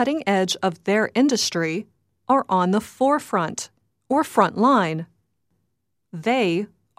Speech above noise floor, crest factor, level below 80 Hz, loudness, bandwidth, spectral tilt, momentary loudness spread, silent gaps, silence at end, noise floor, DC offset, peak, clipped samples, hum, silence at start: 55 dB; 18 dB; -68 dBFS; -21 LUFS; 15.5 kHz; -4.5 dB/octave; 12 LU; none; 0.3 s; -76 dBFS; under 0.1%; -4 dBFS; under 0.1%; none; 0 s